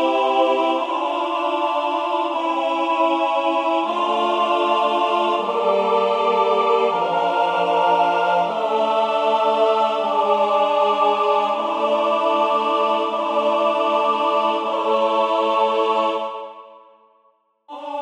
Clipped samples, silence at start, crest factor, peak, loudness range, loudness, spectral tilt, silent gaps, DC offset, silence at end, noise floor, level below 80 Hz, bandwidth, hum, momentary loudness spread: under 0.1%; 0 s; 14 dB; -6 dBFS; 2 LU; -19 LUFS; -4.5 dB/octave; none; under 0.1%; 0 s; -61 dBFS; -78 dBFS; 10.5 kHz; none; 4 LU